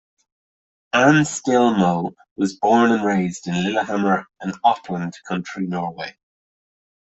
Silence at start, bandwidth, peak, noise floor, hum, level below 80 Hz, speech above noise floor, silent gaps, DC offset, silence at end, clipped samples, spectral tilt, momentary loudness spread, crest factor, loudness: 0.95 s; 8.4 kHz; -2 dBFS; under -90 dBFS; none; -60 dBFS; over 71 dB; 2.31-2.36 s; under 0.1%; 1 s; under 0.1%; -5.5 dB/octave; 12 LU; 18 dB; -20 LUFS